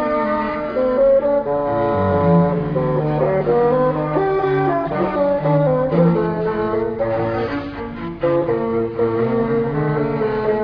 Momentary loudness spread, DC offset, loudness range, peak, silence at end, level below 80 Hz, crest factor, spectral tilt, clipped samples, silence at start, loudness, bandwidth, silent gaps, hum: 6 LU; under 0.1%; 3 LU; -4 dBFS; 0 s; -42 dBFS; 14 dB; -10.5 dB/octave; under 0.1%; 0 s; -18 LUFS; 5.4 kHz; none; none